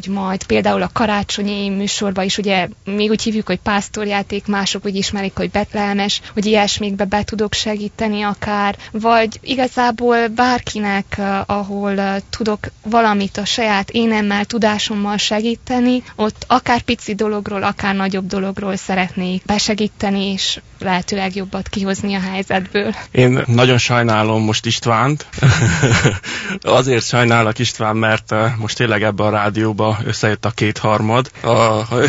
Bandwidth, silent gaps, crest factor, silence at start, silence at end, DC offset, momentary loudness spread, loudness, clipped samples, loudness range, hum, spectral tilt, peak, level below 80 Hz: 8 kHz; none; 16 dB; 0 s; 0 s; under 0.1%; 7 LU; -17 LUFS; under 0.1%; 4 LU; none; -5 dB/octave; 0 dBFS; -42 dBFS